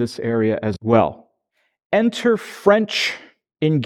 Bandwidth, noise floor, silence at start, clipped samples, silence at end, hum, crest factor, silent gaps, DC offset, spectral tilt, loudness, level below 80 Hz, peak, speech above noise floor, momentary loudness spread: 14 kHz; -69 dBFS; 0 s; under 0.1%; 0 s; none; 20 dB; 1.85-1.90 s; under 0.1%; -6 dB/octave; -19 LUFS; -56 dBFS; 0 dBFS; 51 dB; 7 LU